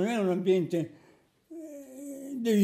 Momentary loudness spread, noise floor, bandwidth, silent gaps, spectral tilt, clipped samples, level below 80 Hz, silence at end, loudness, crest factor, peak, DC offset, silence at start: 18 LU; -62 dBFS; 15.5 kHz; none; -6.5 dB/octave; under 0.1%; -80 dBFS; 0 s; -29 LUFS; 16 dB; -14 dBFS; under 0.1%; 0 s